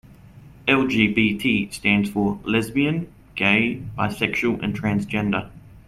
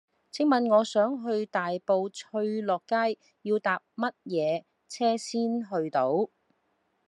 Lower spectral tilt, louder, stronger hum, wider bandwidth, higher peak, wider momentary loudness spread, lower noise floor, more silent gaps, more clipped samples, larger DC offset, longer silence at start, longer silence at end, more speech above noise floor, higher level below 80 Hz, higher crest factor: about the same, -6 dB/octave vs -5 dB/octave; first, -21 LUFS vs -28 LUFS; neither; first, 14.5 kHz vs 11.5 kHz; first, -4 dBFS vs -10 dBFS; about the same, 8 LU vs 9 LU; second, -45 dBFS vs -74 dBFS; neither; neither; neither; about the same, 0.35 s vs 0.35 s; second, 0.1 s vs 0.8 s; second, 24 dB vs 46 dB; first, -48 dBFS vs -86 dBFS; about the same, 20 dB vs 18 dB